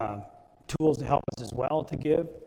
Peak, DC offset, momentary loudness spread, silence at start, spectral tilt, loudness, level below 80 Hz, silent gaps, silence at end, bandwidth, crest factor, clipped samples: -10 dBFS; under 0.1%; 10 LU; 0 s; -7 dB/octave; -29 LUFS; -52 dBFS; none; 0 s; 14.5 kHz; 18 dB; under 0.1%